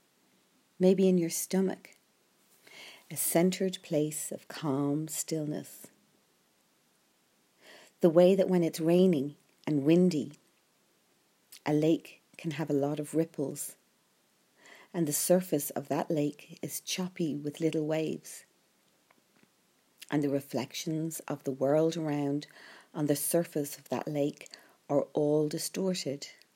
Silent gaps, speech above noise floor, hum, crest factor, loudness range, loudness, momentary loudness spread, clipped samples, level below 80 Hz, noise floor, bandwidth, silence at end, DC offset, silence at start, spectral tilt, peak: none; 40 dB; none; 22 dB; 8 LU; -30 LUFS; 16 LU; under 0.1%; -86 dBFS; -70 dBFS; 16 kHz; 0.25 s; under 0.1%; 0.8 s; -5.5 dB/octave; -10 dBFS